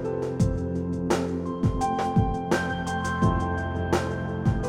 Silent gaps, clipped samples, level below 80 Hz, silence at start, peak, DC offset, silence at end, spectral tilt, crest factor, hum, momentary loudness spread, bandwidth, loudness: none; under 0.1%; -38 dBFS; 0 s; -8 dBFS; under 0.1%; 0 s; -6.5 dB/octave; 16 dB; none; 5 LU; 14.5 kHz; -26 LUFS